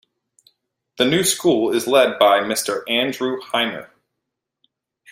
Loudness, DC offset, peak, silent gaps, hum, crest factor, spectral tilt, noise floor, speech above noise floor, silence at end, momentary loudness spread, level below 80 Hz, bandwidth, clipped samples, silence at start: -18 LUFS; under 0.1%; -2 dBFS; none; none; 18 dB; -3 dB/octave; -80 dBFS; 62 dB; 1.25 s; 7 LU; -62 dBFS; 16 kHz; under 0.1%; 1 s